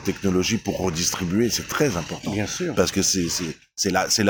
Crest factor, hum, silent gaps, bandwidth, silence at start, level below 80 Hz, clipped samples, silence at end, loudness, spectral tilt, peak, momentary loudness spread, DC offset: 18 dB; none; none; over 20 kHz; 0 s; -50 dBFS; under 0.1%; 0 s; -23 LUFS; -3.5 dB/octave; -6 dBFS; 7 LU; under 0.1%